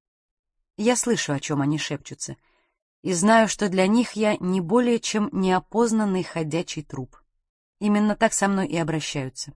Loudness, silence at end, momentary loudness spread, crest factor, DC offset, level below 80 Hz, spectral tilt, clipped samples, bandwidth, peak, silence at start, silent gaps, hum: -23 LUFS; 0.05 s; 12 LU; 18 dB; under 0.1%; -56 dBFS; -4.5 dB/octave; under 0.1%; 10.5 kHz; -6 dBFS; 0.8 s; 2.82-3.03 s, 7.49-7.73 s; none